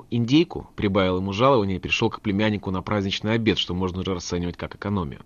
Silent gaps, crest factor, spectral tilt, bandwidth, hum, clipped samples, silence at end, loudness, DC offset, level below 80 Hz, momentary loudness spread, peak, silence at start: none; 18 dB; -6 dB/octave; 7.2 kHz; none; under 0.1%; 0.1 s; -23 LUFS; under 0.1%; -48 dBFS; 8 LU; -6 dBFS; 0 s